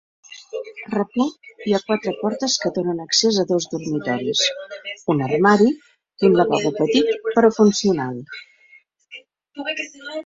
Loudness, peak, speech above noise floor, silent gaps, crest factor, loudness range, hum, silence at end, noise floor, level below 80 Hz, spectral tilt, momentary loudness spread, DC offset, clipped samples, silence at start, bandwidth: -20 LUFS; -2 dBFS; 34 dB; none; 18 dB; 4 LU; none; 0.05 s; -53 dBFS; -62 dBFS; -4 dB/octave; 16 LU; under 0.1%; under 0.1%; 0.3 s; 7.8 kHz